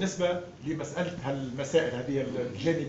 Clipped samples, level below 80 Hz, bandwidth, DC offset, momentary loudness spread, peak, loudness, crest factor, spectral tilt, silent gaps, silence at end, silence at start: under 0.1%; -60 dBFS; 8 kHz; under 0.1%; 7 LU; -12 dBFS; -31 LUFS; 18 dB; -5 dB/octave; none; 0 s; 0 s